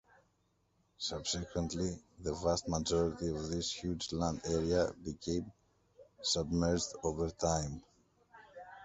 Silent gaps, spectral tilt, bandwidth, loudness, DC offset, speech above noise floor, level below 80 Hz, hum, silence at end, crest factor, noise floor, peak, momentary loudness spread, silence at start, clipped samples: none; -4.5 dB/octave; 8.2 kHz; -36 LUFS; under 0.1%; 40 dB; -52 dBFS; none; 0 s; 20 dB; -76 dBFS; -16 dBFS; 10 LU; 1 s; under 0.1%